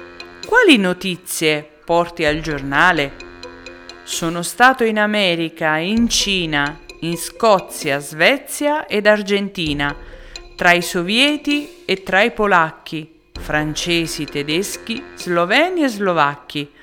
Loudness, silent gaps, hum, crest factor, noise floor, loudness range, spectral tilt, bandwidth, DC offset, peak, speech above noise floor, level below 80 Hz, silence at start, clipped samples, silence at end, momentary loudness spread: -17 LUFS; none; none; 18 dB; -37 dBFS; 3 LU; -3.5 dB/octave; 19 kHz; under 0.1%; 0 dBFS; 20 dB; -42 dBFS; 0 s; under 0.1%; 0.15 s; 16 LU